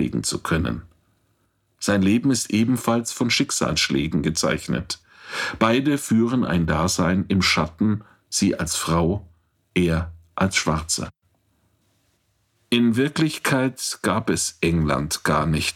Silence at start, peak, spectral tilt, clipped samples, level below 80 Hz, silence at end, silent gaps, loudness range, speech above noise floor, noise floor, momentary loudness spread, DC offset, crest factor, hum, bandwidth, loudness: 0 s; -4 dBFS; -4.5 dB/octave; under 0.1%; -42 dBFS; 0.05 s; none; 4 LU; 46 dB; -67 dBFS; 8 LU; under 0.1%; 18 dB; none; 16.5 kHz; -22 LUFS